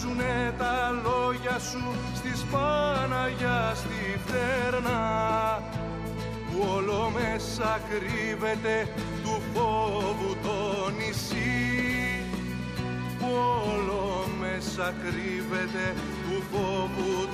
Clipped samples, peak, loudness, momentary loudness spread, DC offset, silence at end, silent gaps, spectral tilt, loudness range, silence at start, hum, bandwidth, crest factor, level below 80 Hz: under 0.1%; -14 dBFS; -29 LUFS; 6 LU; under 0.1%; 0 s; none; -5 dB/octave; 2 LU; 0 s; none; 15.5 kHz; 14 dB; -44 dBFS